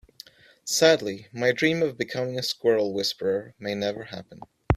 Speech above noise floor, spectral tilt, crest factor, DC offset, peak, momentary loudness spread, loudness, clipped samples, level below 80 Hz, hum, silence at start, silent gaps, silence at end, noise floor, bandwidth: 25 dB; -4 dB/octave; 24 dB; under 0.1%; -2 dBFS; 14 LU; -25 LUFS; under 0.1%; -54 dBFS; none; 0.65 s; none; 0 s; -50 dBFS; 16 kHz